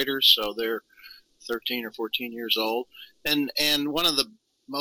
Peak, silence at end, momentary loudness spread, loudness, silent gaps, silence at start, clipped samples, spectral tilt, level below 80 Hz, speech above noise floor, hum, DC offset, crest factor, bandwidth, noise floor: -4 dBFS; 0 s; 16 LU; -24 LUFS; none; 0 s; under 0.1%; -2 dB/octave; -60 dBFS; 25 dB; none; under 0.1%; 24 dB; 18 kHz; -51 dBFS